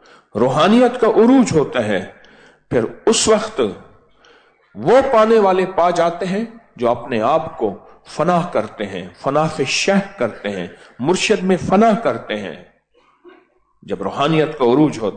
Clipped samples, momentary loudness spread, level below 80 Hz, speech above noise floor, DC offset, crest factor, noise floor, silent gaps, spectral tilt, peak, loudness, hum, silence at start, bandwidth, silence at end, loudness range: under 0.1%; 13 LU; -50 dBFS; 41 dB; under 0.1%; 14 dB; -57 dBFS; none; -5 dB/octave; -4 dBFS; -16 LUFS; none; 0.35 s; 9.4 kHz; 0 s; 4 LU